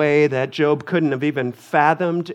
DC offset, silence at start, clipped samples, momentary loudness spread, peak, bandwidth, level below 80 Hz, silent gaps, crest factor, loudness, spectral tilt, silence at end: under 0.1%; 0 s; under 0.1%; 5 LU; -2 dBFS; 11.5 kHz; -68 dBFS; none; 18 dB; -19 LUFS; -7 dB/octave; 0 s